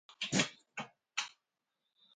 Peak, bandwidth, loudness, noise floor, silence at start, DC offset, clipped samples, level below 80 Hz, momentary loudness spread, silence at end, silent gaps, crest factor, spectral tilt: -18 dBFS; 9.4 kHz; -38 LUFS; -87 dBFS; 0.1 s; under 0.1%; under 0.1%; -76 dBFS; 14 LU; 0.85 s; none; 24 dB; -2.5 dB/octave